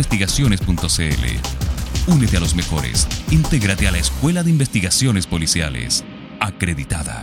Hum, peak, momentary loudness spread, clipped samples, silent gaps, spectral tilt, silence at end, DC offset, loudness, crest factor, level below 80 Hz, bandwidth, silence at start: none; 0 dBFS; 7 LU; under 0.1%; none; -4 dB/octave; 0 s; under 0.1%; -18 LUFS; 18 dB; -26 dBFS; 17 kHz; 0 s